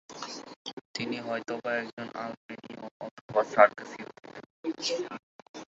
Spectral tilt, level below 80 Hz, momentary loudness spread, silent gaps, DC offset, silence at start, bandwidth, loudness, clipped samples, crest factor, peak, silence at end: -2 dB/octave; -78 dBFS; 22 LU; 0.56-0.65 s, 0.73-0.94 s, 1.93-1.97 s, 2.37-2.49 s, 2.91-3.00 s, 3.11-3.29 s, 4.46-4.63 s, 5.19-5.54 s; under 0.1%; 0.1 s; 8 kHz; -30 LUFS; under 0.1%; 28 dB; -4 dBFS; 0.15 s